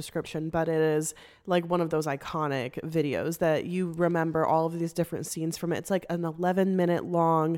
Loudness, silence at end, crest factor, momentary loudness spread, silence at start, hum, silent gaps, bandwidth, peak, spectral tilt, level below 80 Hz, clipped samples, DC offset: -28 LUFS; 0 s; 16 dB; 7 LU; 0 s; none; none; 17 kHz; -12 dBFS; -6 dB/octave; -62 dBFS; under 0.1%; under 0.1%